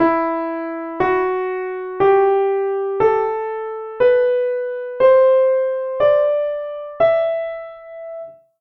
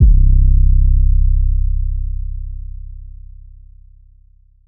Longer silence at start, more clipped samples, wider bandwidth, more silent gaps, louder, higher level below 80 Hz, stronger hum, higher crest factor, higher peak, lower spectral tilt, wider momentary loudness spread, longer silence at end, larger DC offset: about the same, 0 s vs 0 s; neither; first, 5.4 kHz vs 0.5 kHz; neither; about the same, -18 LUFS vs -17 LUFS; second, -56 dBFS vs -14 dBFS; neither; about the same, 14 dB vs 12 dB; about the same, -4 dBFS vs -2 dBFS; second, -8 dB/octave vs -20 dB/octave; second, 15 LU vs 21 LU; second, 0.3 s vs 1.6 s; neither